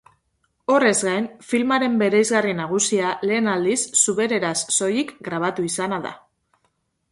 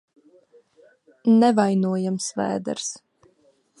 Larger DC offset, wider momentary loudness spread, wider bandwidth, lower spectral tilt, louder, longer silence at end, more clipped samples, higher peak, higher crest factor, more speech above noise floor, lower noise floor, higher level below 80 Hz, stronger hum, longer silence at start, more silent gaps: neither; second, 8 LU vs 13 LU; about the same, 11.5 kHz vs 11 kHz; second, -3 dB/octave vs -5.5 dB/octave; about the same, -20 LUFS vs -22 LUFS; about the same, 0.95 s vs 0.85 s; neither; about the same, -2 dBFS vs -4 dBFS; about the same, 18 dB vs 18 dB; first, 49 dB vs 41 dB; first, -70 dBFS vs -62 dBFS; first, -64 dBFS vs -70 dBFS; neither; second, 0.7 s vs 1.25 s; neither